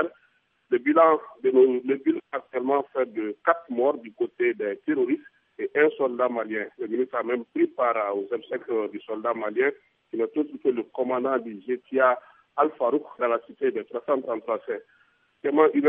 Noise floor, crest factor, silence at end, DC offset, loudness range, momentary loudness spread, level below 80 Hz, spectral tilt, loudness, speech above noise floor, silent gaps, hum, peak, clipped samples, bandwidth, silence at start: -66 dBFS; 20 dB; 0 s; under 0.1%; 4 LU; 10 LU; -84 dBFS; -9 dB/octave; -26 LUFS; 42 dB; none; none; -4 dBFS; under 0.1%; 3.7 kHz; 0 s